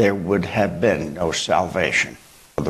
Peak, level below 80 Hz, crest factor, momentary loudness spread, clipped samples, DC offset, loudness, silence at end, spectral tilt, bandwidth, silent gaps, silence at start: -4 dBFS; -46 dBFS; 18 dB; 4 LU; under 0.1%; under 0.1%; -20 LUFS; 0 s; -4.5 dB/octave; 13 kHz; none; 0 s